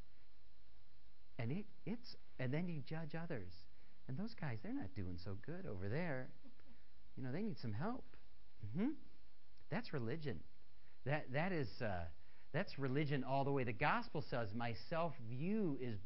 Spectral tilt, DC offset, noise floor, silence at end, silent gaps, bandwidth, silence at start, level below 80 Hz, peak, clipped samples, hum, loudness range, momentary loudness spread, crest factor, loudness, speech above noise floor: -6 dB/octave; 0.7%; -72 dBFS; 0 s; none; 5.6 kHz; 1.05 s; -66 dBFS; -24 dBFS; under 0.1%; none; 6 LU; 11 LU; 22 dB; -45 LUFS; 28 dB